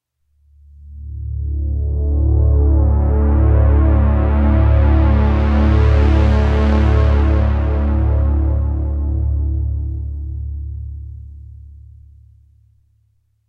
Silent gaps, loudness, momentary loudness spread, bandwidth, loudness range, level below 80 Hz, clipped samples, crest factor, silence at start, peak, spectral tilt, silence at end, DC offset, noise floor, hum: none; -16 LUFS; 14 LU; 4.6 kHz; 12 LU; -18 dBFS; under 0.1%; 12 dB; 0.8 s; -2 dBFS; -9.5 dB/octave; 1.75 s; under 0.1%; -60 dBFS; none